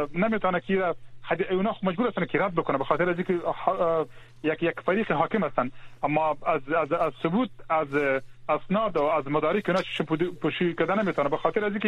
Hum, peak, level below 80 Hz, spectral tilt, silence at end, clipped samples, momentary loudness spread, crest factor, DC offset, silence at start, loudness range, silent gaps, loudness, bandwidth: none; -8 dBFS; -56 dBFS; -7.5 dB/octave; 0 s; under 0.1%; 5 LU; 18 dB; under 0.1%; 0 s; 1 LU; none; -26 LUFS; 10.5 kHz